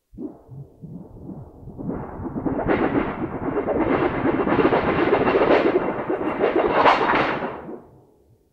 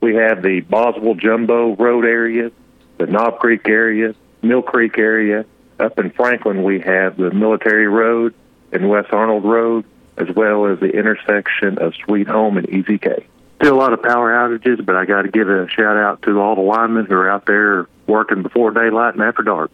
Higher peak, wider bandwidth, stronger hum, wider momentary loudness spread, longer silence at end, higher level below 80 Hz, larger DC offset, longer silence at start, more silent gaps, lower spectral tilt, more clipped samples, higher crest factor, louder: about the same, -2 dBFS vs -2 dBFS; about the same, 7.2 kHz vs 6.8 kHz; neither; first, 22 LU vs 6 LU; first, 0.7 s vs 0.05 s; first, -44 dBFS vs -62 dBFS; neither; first, 0.15 s vs 0 s; neither; about the same, -7.5 dB/octave vs -8 dB/octave; neither; first, 20 dB vs 12 dB; second, -21 LUFS vs -15 LUFS